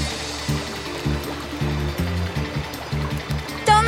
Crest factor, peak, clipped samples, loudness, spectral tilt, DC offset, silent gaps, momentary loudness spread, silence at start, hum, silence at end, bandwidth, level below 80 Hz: 20 dB; -4 dBFS; under 0.1%; -25 LUFS; -5 dB/octave; under 0.1%; none; 4 LU; 0 s; none; 0 s; 16.5 kHz; -34 dBFS